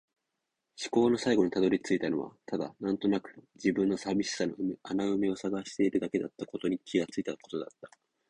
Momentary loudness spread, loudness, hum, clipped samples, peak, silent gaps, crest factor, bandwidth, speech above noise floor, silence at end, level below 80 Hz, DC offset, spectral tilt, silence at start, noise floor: 10 LU; -31 LUFS; none; under 0.1%; -12 dBFS; none; 18 dB; 10.5 kHz; 54 dB; 0.45 s; -68 dBFS; under 0.1%; -5.5 dB/octave; 0.8 s; -85 dBFS